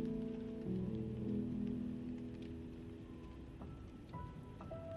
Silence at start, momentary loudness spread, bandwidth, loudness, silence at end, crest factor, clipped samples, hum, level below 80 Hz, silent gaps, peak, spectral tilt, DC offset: 0 s; 11 LU; 11.5 kHz; -46 LUFS; 0 s; 14 dB; under 0.1%; none; -60 dBFS; none; -30 dBFS; -9.5 dB/octave; under 0.1%